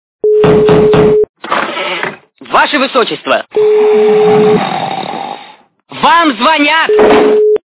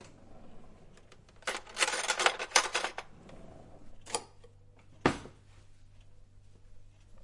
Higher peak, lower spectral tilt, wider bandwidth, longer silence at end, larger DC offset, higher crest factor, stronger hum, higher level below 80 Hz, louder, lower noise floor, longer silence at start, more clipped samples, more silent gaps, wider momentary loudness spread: first, 0 dBFS vs -6 dBFS; first, -9.5 dB/octave vs -1.5 dB/octave; second, 4 kHz vs 11.5 kHz; about the same, 0.1 s vs 0 s; neither; second, 10 dB vs 32 dB; neither; first, -40 dBFS vs -58 dBFS; first, -9 LUFS vs -32 LUFS; second, -37 dBFS vs -56 dBFS; first, 0.25 s vs 0 s; first, 0.1% vs under 0.1%; first, 1.29-1.34 s vs none; second, 11 LU vs 26 LU